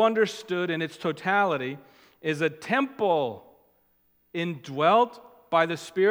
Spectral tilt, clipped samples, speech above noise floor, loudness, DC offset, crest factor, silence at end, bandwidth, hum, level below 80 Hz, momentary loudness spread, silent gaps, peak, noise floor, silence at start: -5.5 dB/octave; under 0.1%; 42 dB; -26 LUFS; under 0.1%; 20 dB; 0 s; 16.5 kHz; none; -78 dBFS; 11 LU; none; -8 dBFS; -67 dBFS; 0 s